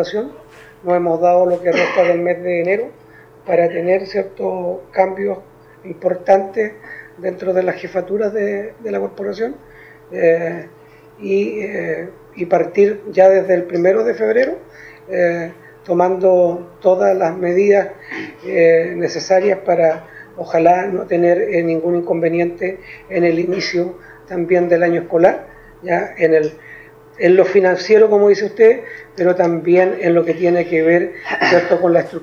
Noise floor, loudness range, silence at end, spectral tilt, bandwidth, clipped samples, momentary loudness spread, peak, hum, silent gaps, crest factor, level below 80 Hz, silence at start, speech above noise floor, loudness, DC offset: -40 dBFS; 7 LU; 0 s; -6.5 dB/octave; 7 kHz; under 0.1%; 13 LU; 0 dBFS; none; none; 16 dB; -56 dBFS; 0 s; 24 dB; -16 LUFS; under 0.1%